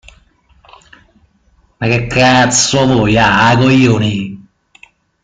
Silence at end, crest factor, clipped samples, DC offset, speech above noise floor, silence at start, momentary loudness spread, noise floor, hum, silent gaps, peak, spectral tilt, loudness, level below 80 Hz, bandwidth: 0.85 s; 14 dB; under 0.1%; under 0.1%; 43 dB; 1.8 s; 9 LU; -53 dBFS; none; none; 0 dBFS; -4.5 dB/octave; -10 LUFS; -38 dBFS; 9.6 kHz